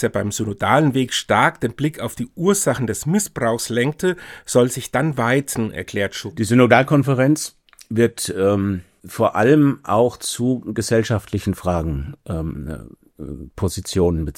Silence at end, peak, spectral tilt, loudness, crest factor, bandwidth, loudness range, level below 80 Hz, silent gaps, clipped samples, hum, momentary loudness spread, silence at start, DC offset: 0.05 s; 0 dBFS; -5 dB/octave; -19 LUFS; 20 dB; 18.5 kHz; 5 LU; -42 dBFS; none; under 0.1%; none; 12 LU; 0 s; under 0.1%